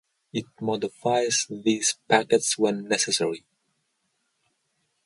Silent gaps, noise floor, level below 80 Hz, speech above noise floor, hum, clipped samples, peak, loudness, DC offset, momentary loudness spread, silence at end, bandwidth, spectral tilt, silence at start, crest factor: none; -74 dBFS; -72 dBFS; 50 dB; none; under 0.1%; -6 dBFS; -24 LUFS; under 0.1%; 12 LU; 1.7 s; 11.5 kHz; -2.5 dB/octave; 0.35 s; 22 dB